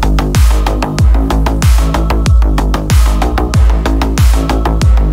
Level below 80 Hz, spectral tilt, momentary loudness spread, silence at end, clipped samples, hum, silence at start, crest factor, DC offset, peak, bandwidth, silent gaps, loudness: -10 dBFS; -6 dB/octave; 3 LU; 0 s; under 0.1%; none; 0 s; 8 dB; under 0.1%; 0 dBFS; 15.5 kHz; none; -12 LUFS